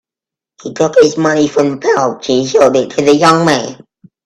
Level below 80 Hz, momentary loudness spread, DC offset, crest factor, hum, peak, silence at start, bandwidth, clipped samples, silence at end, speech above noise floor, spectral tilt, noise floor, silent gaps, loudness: -52 dBFS; 8 LU; under 0.1%; 12 dB; none; 0 dBFS; 0.65 s; 12 kHz; under 0.1%; 0.5 s; 76 dB; -5 dB/octave; -86 dBFS; none; -11 LUFS